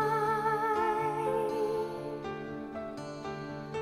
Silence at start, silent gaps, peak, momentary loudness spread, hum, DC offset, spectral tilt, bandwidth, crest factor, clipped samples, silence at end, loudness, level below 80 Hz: 0 s; none; -18 dBFS; 11 LU; none; under 0.1%; -6 dB/octave; 15.5 kHz; 14 dB; under 0.1%; 0 s; -33 LUFS; -62 dBFS